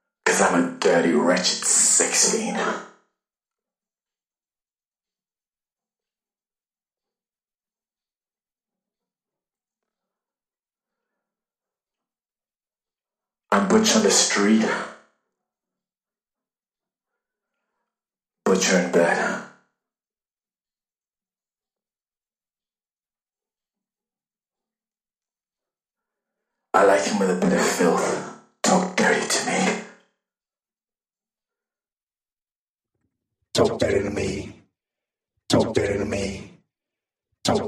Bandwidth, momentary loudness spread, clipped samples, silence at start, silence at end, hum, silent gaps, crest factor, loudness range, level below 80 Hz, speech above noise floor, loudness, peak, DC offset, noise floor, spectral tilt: 15.5 kHz; 12 LU; under 0.1%; 0.25 s; 0 s; none; 4.88-4.92 s, 22.91-22.95 s, 32.03-32.07 s, 32.56-32.75 s; 22 dB; 10 LU; -56 dBFS; over 70 dB; -20 LUFS; -4 dBFS; under 0.1%; under -90 dBFS; -3 dB/octave